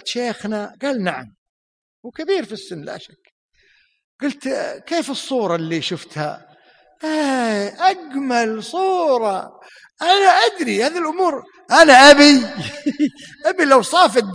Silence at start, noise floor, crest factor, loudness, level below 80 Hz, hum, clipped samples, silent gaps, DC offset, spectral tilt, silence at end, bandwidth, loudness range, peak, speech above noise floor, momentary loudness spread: 0.05 s; -58 dBFS; 18 dB; -16 LUFS; -56 dBFS; none; under 0.1%; 1.38-2.03 s, 3.32-3.49 s, 4.04-4.19 s; under 0.1%; -3 dB/octave; 0 s; 10.5 kHz; 15 LU; 0 dBFS; 42 dB; 18 LU